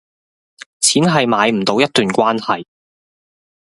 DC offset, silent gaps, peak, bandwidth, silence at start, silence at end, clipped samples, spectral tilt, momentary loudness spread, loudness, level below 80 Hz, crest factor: under 0.1%; none; 0 dBFS; 12 kHz; 0.8 s; 1.05 s; under 0.1%; -3.5 dB/octave; 7 LU; -15 LUFS; -58 dBFS; 18 dB